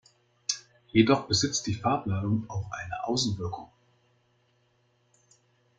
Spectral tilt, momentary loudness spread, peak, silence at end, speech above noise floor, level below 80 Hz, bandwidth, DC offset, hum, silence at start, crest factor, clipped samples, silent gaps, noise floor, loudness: -4.5 dB/octave; 13 LU; -6 dBFS; 2.15 s; 42 dB; -60 dBFS; 9.4 kHz; under 0.1%; none; 0.5 s; 24 dB; under 0.1%; none; -69 dBFS; -28 LUFS